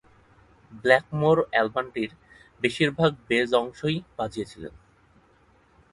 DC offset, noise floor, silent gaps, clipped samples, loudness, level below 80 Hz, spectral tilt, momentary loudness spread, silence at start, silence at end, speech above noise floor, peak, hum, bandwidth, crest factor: under 0.1%; -60 dBFS; none; under 0.1%; -25 LUFS; -58 dBFS; -6 dB/octave; 13 LU; 0.7 s; 1.25 s; 35 dB; -4 dBFS; none; 11.5 kHz; 22 dB